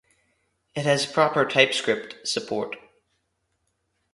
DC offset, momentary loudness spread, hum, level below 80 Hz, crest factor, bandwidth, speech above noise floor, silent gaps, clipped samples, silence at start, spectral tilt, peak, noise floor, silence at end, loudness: under 0.1%; 14 LU; none; -68 dBFS; 26 dB; 11.5 kHz; 51 dB; none; under 0.1%; 0.75 s; -3.5 dB/octave; -2 dBFS; -74 dBFS; 1.35 s; -23 LUFS